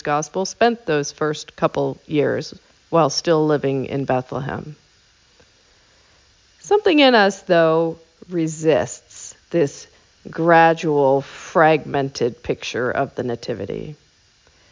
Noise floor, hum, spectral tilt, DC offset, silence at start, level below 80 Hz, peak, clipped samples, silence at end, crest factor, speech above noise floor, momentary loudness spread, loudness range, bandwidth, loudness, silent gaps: -56 dBFS; none; -5 dB/octave; under 0.1%; 0.05 s; -56 dBFS; -2 dBFS; under 0.1%; 0.8 s; 18 dB; 37 dB; 16 LU; 4 LU; 7.6 kHz; -19 LUFS; none